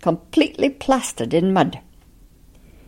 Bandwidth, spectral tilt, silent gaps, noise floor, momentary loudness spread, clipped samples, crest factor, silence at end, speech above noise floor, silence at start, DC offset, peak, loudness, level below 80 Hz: 16.5 kHz; -5.5 dB/octave; none; -49 dBFS; 4 LU; under 0.1%; 18 dB; 1.1 s; 30 dB; 0 s; under 0.1%; -4 dBFS; -20 LUFS; -48 dBFS